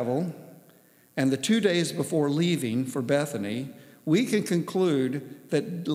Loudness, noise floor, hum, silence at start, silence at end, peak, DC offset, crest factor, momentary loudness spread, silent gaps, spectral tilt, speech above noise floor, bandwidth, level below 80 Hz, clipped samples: -27 LUFS; -58 dBFS; none; 0 s; 0 s; -8 dBFS; under 0.1%; 18 dB; 11 LU; none; -5.5 dB/octave; 32 dB; 16 kHz; -82 dBFS; under 0.1%